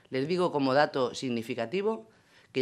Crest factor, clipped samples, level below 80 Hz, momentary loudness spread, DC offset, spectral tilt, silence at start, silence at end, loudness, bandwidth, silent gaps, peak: 20 dB; under 0.1%; -76 dBFS; 8 LU; under 0.1%; -5.5 dB/octave; 0.1 s; 0 s; -29 LUFS; 12.5 kHz; none; -10 dBFS